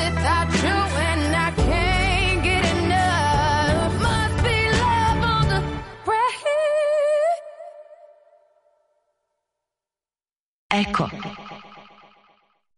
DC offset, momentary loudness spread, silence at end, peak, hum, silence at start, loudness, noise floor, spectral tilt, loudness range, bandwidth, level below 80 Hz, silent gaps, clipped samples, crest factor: under 0.1%; 11 LU; 0.95 s; -8 dBFS; none; 0 s; -21 LUFS; under -90 dBFS; -5 dB/octave; 10 LU; 11.5 kHz; -32 dBFS; 10.40-10.70 s; under 0.1%; 14 dB